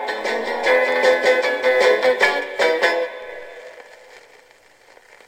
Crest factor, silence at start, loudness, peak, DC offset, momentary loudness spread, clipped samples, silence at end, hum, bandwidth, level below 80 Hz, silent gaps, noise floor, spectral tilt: 18 dB; 0 s; -17 LUFS; -2 dBFS; under 0.1%; 19 LU; under 0.1%; 1.1 s; none; 16 kHz; -64 dBFS; none; -51 dBFS; -1.5 dB/octave